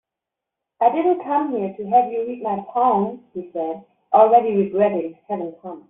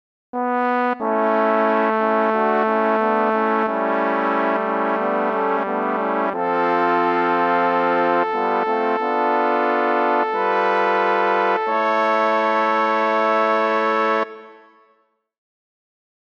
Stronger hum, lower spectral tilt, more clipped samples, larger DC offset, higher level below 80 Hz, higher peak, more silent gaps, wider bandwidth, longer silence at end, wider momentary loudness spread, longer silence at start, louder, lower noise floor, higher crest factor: neither; about the same, -6.5 dB/octave vs -6.5 dB/octave; neither; neither; first, -66 dBFS vs -76 dBFS; first, -2 dBFS vs -6 dBFS; neither; second, 3.8 kHz vs 7 kHz; second, 0.1 s vs 1.7 s; first, 14 LU vs 3 LU; first, 0.8 s vs 0.35 s; about the same, -20 LUFS vs -19 LUFS; first, -85 dBFS vs -63 dBFS; about the same, 18 dB vs 14 dB